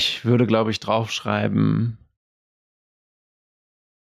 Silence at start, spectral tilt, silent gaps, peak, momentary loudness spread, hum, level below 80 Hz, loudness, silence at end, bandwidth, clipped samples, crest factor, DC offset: 0 s; -6 dB/octave; none; -6 dBFS; 6 LU; none; -60 dBFS; -21 LUFS; 2.15 s; 13.5 kHz; under 0.1%; 18 dB; under 0.1%